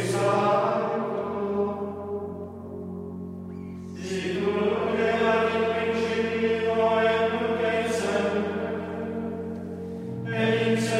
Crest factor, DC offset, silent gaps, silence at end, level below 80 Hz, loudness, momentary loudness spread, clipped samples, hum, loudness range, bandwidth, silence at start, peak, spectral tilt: 14 dB; under 0.1%; none; 0 s; -62 dBFS; -26 LUFS; 14 LU; under 0.1%; none; 7 LU; 13.5 kHz; 0 s; -12 dBFS; -5.5 dB/octave